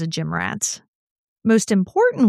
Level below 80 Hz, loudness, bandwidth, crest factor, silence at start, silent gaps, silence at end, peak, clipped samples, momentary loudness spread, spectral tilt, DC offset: -60 dBFS; -20 LUFS; 15 kHz; 16 dB; 0 s; 0.88-1.36 s; 0 s; -4 dBFS; under 0.1%; 8 LU; -5 dB/octave; under 0.1%